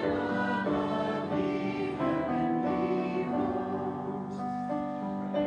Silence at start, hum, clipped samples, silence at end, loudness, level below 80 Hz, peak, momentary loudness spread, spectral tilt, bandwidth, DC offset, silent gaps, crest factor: 0 s; none; under 0.1%; 0 s; -31 LUFS; -60 dBFS; -16 dBFS; 5 LU; -8 dB/octave; 9.6 kHz; under 0.1%; none; 14 dB